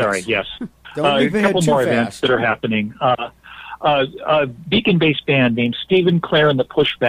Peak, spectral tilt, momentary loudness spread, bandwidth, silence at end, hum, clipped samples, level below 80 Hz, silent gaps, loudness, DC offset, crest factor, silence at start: -2 dBFS; -5.5 dB/octave; 7 LU; 15 kHz; 0 s; none; under 0.1%; -50 dBFS; none; -17 LUFS; under 0.1%; 16 dB; 0 s